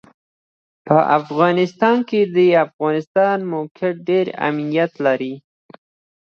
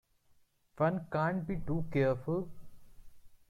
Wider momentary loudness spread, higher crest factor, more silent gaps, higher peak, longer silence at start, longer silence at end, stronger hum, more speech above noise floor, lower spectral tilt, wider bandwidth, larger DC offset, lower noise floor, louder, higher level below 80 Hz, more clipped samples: about the same, 8 LU vs 6 LU; about the same, 18 dB vs 18 dB; first, 2.73-2.79 s, 3.07-3.15 s, 3.71-3.75 s vs none; first, 0 dBFS vs -18 dBFS; about the same, 0.85 s vs 0.75 s; first, 0.8 s vs 0.15 s; neither; first, over 73 dB vs 35 dB; second, -7.5 dB/octave vs -9 dB/octave; second, 6.8 kHz vs 11.5 kHz; neither; first, under -90 dBFS vs -68 dBFS; first, -18 LUFS vs -34 LUFS; second, -70 dBFS vs -54 dBFS; neither